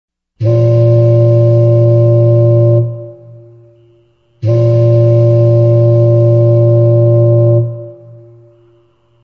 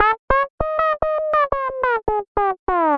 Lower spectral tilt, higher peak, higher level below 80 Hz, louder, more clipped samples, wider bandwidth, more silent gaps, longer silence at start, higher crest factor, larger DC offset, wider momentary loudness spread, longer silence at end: first, -12 dB/octave vs -7.5 dB/octave; about the same, 0 dBFS vs 0 dBFS; second, -46 dBFS vs -36 dBFS; first, -9 LUFS vs -20 LUFS; neither; second, 2.9 kHz vs 6 kHz; second, none vs 0.19-0.28 s, 0.50-0.58 s, 2.28-2.35 s, 2.59-2.67 s; first, 0.4 s vs 0 s; second, 8 dB vs 18 dB; neither; first, 6 LU vs 3 LU; first, 1.3 s vs 0 s